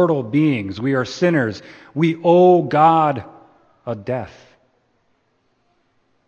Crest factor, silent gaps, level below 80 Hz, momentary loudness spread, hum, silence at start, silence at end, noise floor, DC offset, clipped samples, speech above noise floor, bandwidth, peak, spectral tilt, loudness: 18 dB; none; -60 dBFS; 17 LU; none; 0 s; 2 s; -65 dBFS; under 0.1%; under 0.1%; 48 dB; 7.4 kHz; -2 dBFS; -7.5 dB/octave; -17 LUFS